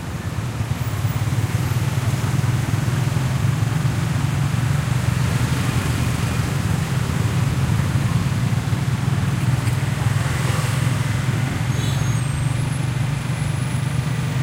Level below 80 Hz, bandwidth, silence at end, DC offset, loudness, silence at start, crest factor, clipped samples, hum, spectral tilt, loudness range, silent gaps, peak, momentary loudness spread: -36 dBFS; 16 kHz; 0 s; under 0.1%; -21 LUFS; 0 s; 14 dB; under 0.1%; none; -6 dB/octave; 1 LU; none; -6 dBFS; 2 LU